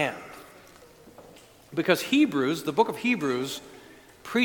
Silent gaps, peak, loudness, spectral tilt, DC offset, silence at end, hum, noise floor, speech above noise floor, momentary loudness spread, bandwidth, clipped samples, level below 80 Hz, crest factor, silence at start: none; -6 dBFS; -26 LUFS; -4.5 dB/octave; under 0.1%; 0 s; none; -52 dBFS; 27 dB; 22 LU; 19 kHz; under 0.1%; -66 dBFS; 22 dB; 0 s